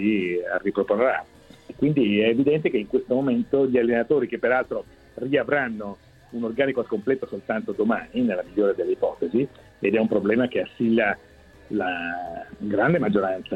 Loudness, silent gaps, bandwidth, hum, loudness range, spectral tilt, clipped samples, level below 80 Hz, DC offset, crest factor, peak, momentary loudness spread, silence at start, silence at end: -24 LUFS; none; 7.8 kHz; none; 4 LU; -8.5 dB/octave; under 0.1%; -56 dBFS; under 0.1%; 18 dB; -6 dBFS; 10 LU; 0 s; 0 s